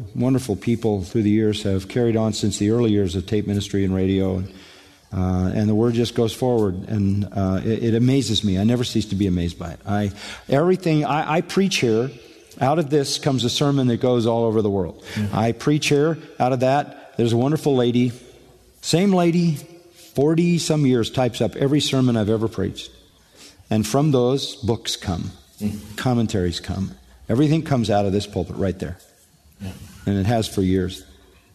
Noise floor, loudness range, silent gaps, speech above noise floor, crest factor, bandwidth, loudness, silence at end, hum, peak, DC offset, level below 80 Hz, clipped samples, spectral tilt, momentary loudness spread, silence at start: -54 dBFS; 3 LU; none; 34 dB; 16 dB; 13.5 kHz; -21 LUFS; 0.5 s; none; -4 dBFS; under 0.1%; -48 dBFS; under 0.1%; -6 dB/octave; 10 LU; 0 s